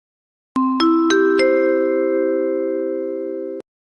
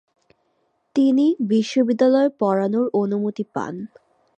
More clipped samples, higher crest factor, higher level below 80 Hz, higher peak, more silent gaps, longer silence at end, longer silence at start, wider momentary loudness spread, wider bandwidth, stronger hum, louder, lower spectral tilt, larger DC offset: neither; about the same, 12 dB vs 16 dB; first, -62 dBFS vs -72 dBFS; about the same, -6 dBFS vs -6 dBFS; neither; about the same, 0.4 s vs 0.5 s; second, 0.55 s vs 0.95 s; about the same, 12 LU vs 11 LU; about the same, 8.8 kHz vs 8.6 kHz; neither; about the same, -18 LUFS vs -20 LUFS; second, -3.5 dB/octave vs -7 dB/octave; neither